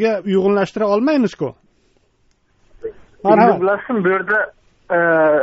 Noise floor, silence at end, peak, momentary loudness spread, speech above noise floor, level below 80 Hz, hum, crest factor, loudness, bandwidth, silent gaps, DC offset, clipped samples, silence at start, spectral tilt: -60 dBFS; 0 s; 0 dBFS; 15 LU; 44 dB; -56 dBFS; none; 16 dB; -16 LUFS; 7.8 kHz; none; under 0.1%; under 0.1%; 0 s; -5 dB/octave